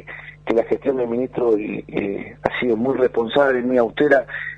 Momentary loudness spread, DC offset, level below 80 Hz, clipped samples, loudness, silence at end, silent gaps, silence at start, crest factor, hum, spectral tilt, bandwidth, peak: 8 LU; under 0.1%; -52 dBFS; under 0.1%; -20 LUFS; 0 s; none; 0.05 s; 20 dB; 50 Hz at -45 dBFS; -7.5 dB/octave; 7.6 kHz; 0 dBFS